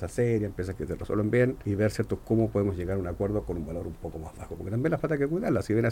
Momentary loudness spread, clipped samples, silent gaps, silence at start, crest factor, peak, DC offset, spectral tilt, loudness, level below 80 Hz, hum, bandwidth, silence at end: 11 LU; under 0.1%; none; 0 s; 16 dB; -12 dBFS; under 0.1%; -8 dB/octave; -29 LUFS; -46 dBFS; none; 16.5 kHz; 0 s